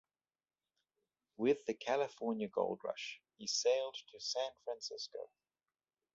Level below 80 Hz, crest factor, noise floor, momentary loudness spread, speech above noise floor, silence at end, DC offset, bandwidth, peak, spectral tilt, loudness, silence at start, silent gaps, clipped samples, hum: -84 dBFS; 20 dB; under -90 dBFS; 11 LU; over 51 dB; 0.9 s; under 0.1%; 8 kHz; -22 dBFS; -2 dB/octave; -39 LUFS; 1.4 s; none; under 0.1%; none